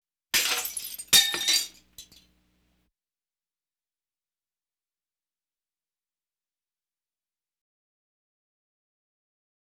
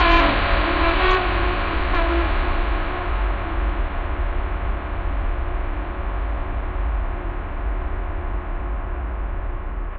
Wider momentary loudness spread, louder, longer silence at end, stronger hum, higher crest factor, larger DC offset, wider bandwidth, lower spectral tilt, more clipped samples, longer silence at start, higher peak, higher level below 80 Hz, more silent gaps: first, 15 LU vs 11 LU; about the same, -22 LUFS vs -24 LUFS; first, 7.55 s vs 0 s; neither; first, 28 dB vs 18 dB; neither; first, over 20 kHz vs 5 kHz; second, 2 dB/octave vs -7.5 dB/octave; neither; first, 0.35 s vs 0 s; second, -6 dBFS vs -2 dBFS; second, -68 dBFS vs -24 dBFS; neither